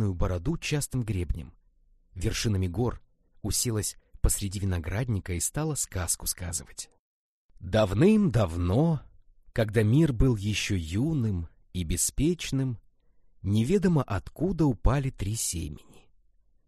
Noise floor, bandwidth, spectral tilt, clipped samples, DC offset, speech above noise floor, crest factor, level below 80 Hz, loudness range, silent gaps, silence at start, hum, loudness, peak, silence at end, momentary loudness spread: -63 dBFS; 13 kHz; -5.5 dB/octave; under 0.1%; under 0.1%; 36 dB; 20 dB; -38 dBFS; 6 LU; 6.99-7.49 s; 0 s; none; -28 LUFS; -8 dBFS; 0.85 s; 12 LU